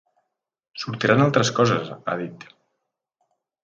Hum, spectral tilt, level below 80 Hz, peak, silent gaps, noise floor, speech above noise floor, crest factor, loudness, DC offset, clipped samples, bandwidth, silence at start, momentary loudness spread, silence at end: none; -5.5 dB/octave; -62 dBFS; 0 dBFS; none; -79 dBFS; 58 dB; 24 dB; -21 LUFS; under 0.1%; under 0.1%; 7.8 kHz; 0.75 s; 16 LU; 1.25 s